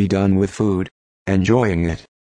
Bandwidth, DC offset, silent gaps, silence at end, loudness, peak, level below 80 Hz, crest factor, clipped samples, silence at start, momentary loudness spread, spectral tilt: 9.8 kHz; under 0.1%; 0.91-1.26 s; 0.25 s; -19 LUFS; -4 dBFS; -40 dBFS; 14 dB; under 0.1%; 0 s; 9 LU; -7.5 dB/octave